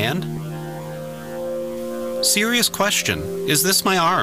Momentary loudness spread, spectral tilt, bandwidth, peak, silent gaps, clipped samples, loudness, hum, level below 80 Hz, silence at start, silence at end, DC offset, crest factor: 15 LU; -2.5 dB/octave; 16 kHz; -6 dBFS; none; under 0.1%; -19 LUFS; none; -50 dBFS; 0 s; 0 s; under 0.1%; 16 dB